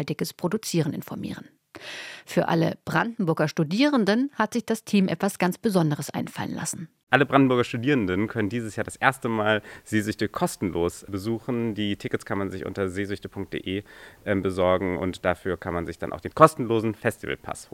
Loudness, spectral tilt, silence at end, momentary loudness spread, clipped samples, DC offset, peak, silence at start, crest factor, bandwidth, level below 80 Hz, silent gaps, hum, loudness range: -25 LUFS; -5.5 dB/octave; 0.1 s; 12 LU; under 0.1%; under 0.1%; 0 dBFS; 0 s; 26 dB; 16.5 kHz; -58 dBFS; 7.03-7.07 s; none; 5 LU